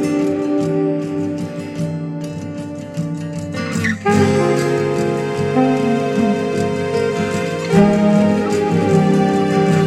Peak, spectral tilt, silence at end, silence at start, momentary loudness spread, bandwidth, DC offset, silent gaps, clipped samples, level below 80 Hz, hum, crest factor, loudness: 0 dBFS; -7 dB/octave; 0 s; 0 s; 11 LU; 13 kHz; under 0.1%; none; under 0.1%; -50 dBFS; none; 16 dB; -17 LUFS